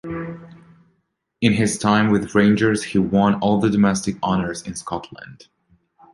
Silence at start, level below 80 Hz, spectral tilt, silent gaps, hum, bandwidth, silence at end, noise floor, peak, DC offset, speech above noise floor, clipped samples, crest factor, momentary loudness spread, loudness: 0.05 s; -48 dBFS; -5.5 dB/octave; none; none; 11.5 kHz; 0.8 s; -70 dBFS; -2 dBFS; under 0.1%; 52 dB; under 0.1%; 18 dB; 14 LU; -19 LUFS